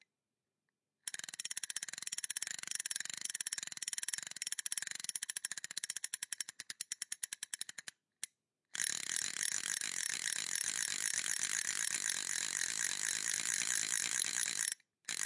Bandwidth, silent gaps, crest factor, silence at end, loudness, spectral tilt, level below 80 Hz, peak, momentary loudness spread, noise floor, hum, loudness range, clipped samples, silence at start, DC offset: 11.5 kHz; none; 24 dB; 0 s; -37 LUFS; 2.5 dB/octave; under -90 dBFS; -16 dBFS; 9 LU; under -90 dBFS; none; 7 LU; under 0.1%; 1.05 s; under 0.1%